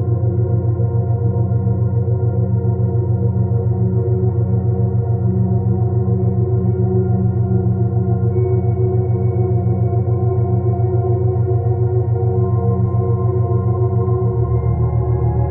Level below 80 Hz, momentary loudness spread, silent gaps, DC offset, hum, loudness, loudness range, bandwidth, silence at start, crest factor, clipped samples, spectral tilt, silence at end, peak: -34 dBFS; 1 LU; none; under 0.1%; none; -17 LUFS; 0 LU; 2.2 kHz; 0 s; 10 dB; under 0.1%; -15 dB/octave; 0 s; -4 dBFS